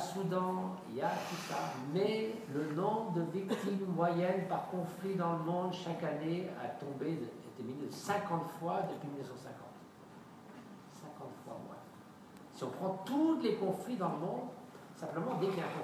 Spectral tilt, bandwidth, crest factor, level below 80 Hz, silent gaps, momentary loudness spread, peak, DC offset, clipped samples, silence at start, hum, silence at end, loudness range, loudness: -6.5 dB/octave; 15.5 kHz; 20 dB; -82 dBFS; none; 19 LU; -18 dBFS; under 0.1%; under 0.1%; 0 s; none; 0 s; 11 LU; -38 LUFS